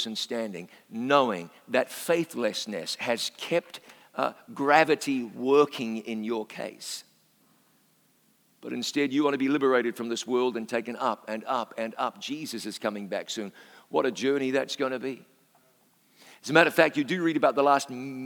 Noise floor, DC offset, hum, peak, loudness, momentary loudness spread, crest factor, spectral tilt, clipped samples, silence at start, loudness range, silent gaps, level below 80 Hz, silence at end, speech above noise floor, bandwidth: -66 dBFS; under 0.1%; none; -2 dBFS; -27 LUFS; 14 LU; 26 dB; -4 dB/octave; under 0.1%; 0 s; 6 LU; none; -90 dBFS; 0 s; 38 dB; over 20 kHz